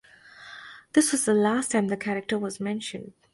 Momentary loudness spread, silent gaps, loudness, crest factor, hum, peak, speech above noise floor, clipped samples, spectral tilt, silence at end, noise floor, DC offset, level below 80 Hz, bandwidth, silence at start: 20 LU; none; -25 LUFS; 20 dB; none; -8 dBFS; 24 dB; under 0.1%; -4 dB/octave; 0.25 s; -49 dBFS; under 0.1%; -68 dBFS; 12 kHz; 0.4 s